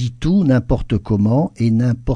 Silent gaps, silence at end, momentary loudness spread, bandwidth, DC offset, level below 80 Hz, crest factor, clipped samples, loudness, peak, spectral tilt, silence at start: none; 0 s; 5 LU; 9.8 kHz; under 0.1%; -30 dBFS; 12 dB; under 0.1%; -17 LUFS; -4 dBFS; -9 dB/octave; 0 s